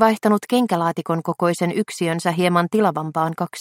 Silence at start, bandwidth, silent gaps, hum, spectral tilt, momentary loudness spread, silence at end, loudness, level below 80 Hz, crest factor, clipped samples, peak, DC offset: 0 s; 16.5 kHz; none; none; -6 dB/octave; 5 LU; 0 s; -20 LUFS; -64 dBFS; 18 dB; under 0.1%; -2 dBFS; under 0.1%